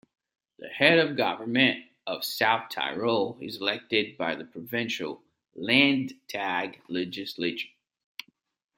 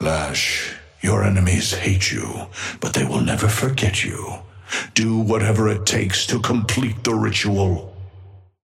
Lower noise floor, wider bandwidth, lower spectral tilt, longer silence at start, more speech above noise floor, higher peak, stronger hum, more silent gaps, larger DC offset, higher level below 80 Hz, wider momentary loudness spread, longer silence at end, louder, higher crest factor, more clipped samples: first, -48 dBFS vs -43 dBFS; about the same, 16.5 kHz vs 16 kHz; about the same, -4.5 dB/octave vs -4.5 dB/octave; first, 0.6 s vs 0 s; second, 20 dB vs 24 dB; about the same, -6 dBFS vs -4 dBFS; neither; neither; neither; second, -74 dBFS vs -42 dBFS; first, 18 LU vs 11 LU; first, 1.1 s vs 0.25 s; second, -27 LUFS vs -20 LUFS; first, 24 dB vs 18 dB; neither